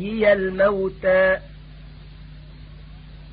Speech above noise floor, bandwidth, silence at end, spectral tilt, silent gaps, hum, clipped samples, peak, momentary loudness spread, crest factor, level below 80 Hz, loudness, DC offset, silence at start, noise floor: 21 dB; 5 kHz; 0 s; -10.5 dB/octave; none; none; under 0.1%; -6 dBFS; 4 LU; 16 dB; -42 dBFS; -19 LUFS; under 0.1%; 0 s; -41 dBFS